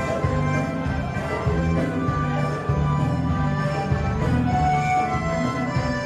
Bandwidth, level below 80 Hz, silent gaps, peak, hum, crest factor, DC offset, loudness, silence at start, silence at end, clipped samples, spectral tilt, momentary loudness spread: 10.5 kHz; -34 dBFS; none; -8 dBFS; none; 14 dB; under 0.1%; -23 LUFS; 0 s; 0 s; under 0.1%; -7.5 dB/octave; 4 LU